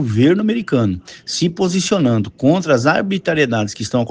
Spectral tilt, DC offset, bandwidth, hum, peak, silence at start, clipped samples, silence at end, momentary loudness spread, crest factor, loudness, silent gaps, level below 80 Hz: -5.5 dB/octave; under 0.1%; 10 kHz; none; 0 dBFS; 0 s; under 0.1%; 0 s; 6 LU; 16 dB; -16 LUFS; none; -52 dBFS